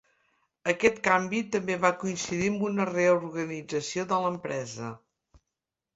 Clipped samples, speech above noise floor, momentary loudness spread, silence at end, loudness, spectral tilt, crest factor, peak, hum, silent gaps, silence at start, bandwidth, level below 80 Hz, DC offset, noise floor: under 0.1%; 60 dB; 10 LU; 1 s; -28 LUFS; -4.5 dB/octave; 22 dB; -6 dBFS; none; none; 0.65 s; 8 kHz; -64 dBFS; under 0.1%; -87 dBFS